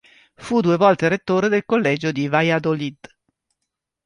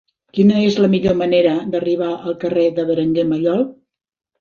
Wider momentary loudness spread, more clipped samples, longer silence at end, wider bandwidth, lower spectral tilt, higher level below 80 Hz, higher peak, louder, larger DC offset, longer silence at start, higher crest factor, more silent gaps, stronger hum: about the same, 8 LU vs 7 LU; neither; first, 1.1 s vs 0.7 s; first, 11 kHz vs 7 kHz; about the same, -6.5 dB/octave vs -7.5 dB/octave; second, -60 dBFS vs -50 dBFS; about the same, -2 dBFS vs -2 dBFS; about the same, -19 LUFS vs -17 LUFS; neither; about the same, 0.4 s vs 0.35 s; about the same, 18 dB vs 14 dB; neither; neither